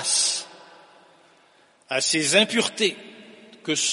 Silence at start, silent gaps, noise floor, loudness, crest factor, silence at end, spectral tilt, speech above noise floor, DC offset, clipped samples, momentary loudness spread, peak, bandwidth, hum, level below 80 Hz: 0 s; none; -58 dBFS; -21 LUFS; 22 dB; 0 s; -1 dB/octave; 36 dB; under 0.1%; under 0.1%; 21 LU; -2 dBFS; 11.5 kHz; none; -78 dBFS